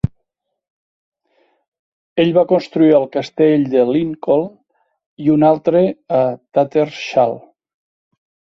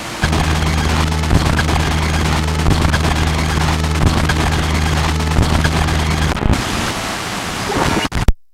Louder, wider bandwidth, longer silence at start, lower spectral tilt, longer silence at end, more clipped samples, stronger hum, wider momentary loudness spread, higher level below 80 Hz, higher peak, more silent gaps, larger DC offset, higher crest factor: about the same, -15 LUFS vs -16 LUFS; second, 6.6 kHz vs 15.5 kHz; about the same, 0.05 s vs 0 s; first, -8 dB/octave vs -5 dB/octave; first, 1.15 s vs 0.1 s; neither; neither; first, 8 LU vs 4 LU; second, -48 dBFS vs -20 dBFS; about the same, -2 dBFS vs 0 dBFS; first, 0.70-1.12 s, 1.68-1.72 s, 1.79-2.16 s, 5.06-5.17 s vs none; neither; about the same, 16 dB vs 16 dB